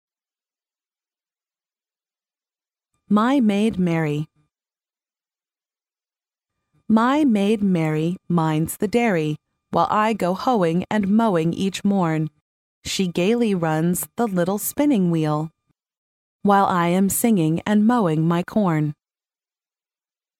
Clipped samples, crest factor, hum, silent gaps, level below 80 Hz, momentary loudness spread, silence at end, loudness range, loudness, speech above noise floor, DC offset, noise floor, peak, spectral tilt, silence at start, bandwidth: under 0.1%; 18 dB; none; 12.41-12.82 s, 15.97-16.39 s; -58 dBFS; 7 LU; 1.45 s; 5 LU; -20 LUFS; over 71 dB; under 0.1%; under -90 dBFS; -4 dBFS; -6 dB/octave; 3.1 s; 16.5 kHz